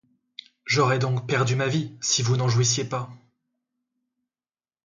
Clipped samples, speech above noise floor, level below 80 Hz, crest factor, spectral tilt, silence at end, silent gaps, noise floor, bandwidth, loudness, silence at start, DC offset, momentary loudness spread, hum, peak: under 0.1%; over 67 dB; -62 dBFS; 18 dB; -4 dB/octave; 1.7 s; none; under -90 dBFS; 9.2 kHz; -23 LUFS; 0.65 s; under 0.1%; 19 LU; none; -8 dBFS